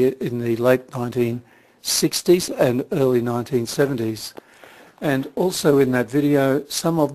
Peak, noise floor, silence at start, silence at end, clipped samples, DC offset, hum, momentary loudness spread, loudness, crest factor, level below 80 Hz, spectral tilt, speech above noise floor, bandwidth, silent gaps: -2 dBFS; -47 dBFS; 0 s; 0 s; under 0.1%; under 0.1%; none; 9 LU; -20 LUFS; 20 dB; -58 dBFS; -5 dB/octave; 27 dB; 14 kHz; none